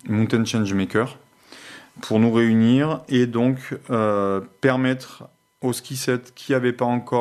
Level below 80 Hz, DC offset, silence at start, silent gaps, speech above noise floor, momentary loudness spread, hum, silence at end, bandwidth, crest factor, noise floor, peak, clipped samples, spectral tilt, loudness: -66 dBFS; under 0.1%; 0.05 s; none; 24 dB; 12 LU; none; 0 s; 13.5 kHz; 18 dB; -44 dBFS; -4 dBFS; under 0.1%; -6 dB/octave; -21 LUFS